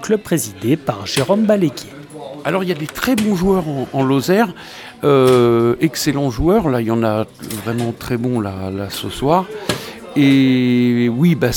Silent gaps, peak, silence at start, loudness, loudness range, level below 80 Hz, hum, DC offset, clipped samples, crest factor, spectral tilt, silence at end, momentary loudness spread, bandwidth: none; 0 dBFS; 0 s; -17 LUFS; 4 LU; -40 dBFS; none; under 0.1%; under 0.1%; 16 dB; -6 dB/octave; 0 s; 11 LU; 19 kHz